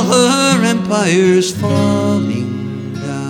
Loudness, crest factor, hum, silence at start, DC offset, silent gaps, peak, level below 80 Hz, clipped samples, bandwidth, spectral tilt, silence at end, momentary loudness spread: -14 LUFS; 14 dB; none; 0 s; under 0.1%; none; 0 dBFS; -52 dBFS; under 0.1%; 16.5 kHz; -5 dB/octave; 0 s; 12 LU